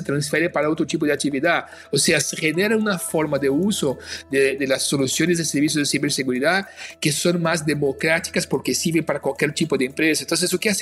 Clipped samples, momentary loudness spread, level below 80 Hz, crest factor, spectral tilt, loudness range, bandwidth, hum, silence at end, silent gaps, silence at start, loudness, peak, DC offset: under 0.1%; 4 LU; -56 dBFS; 18 dB; -3.5 dB/octave; 1 LU; 15 kHz; none; 0 s; none; 0 s; -20 LUFS; -4 dBFS; under 0.1%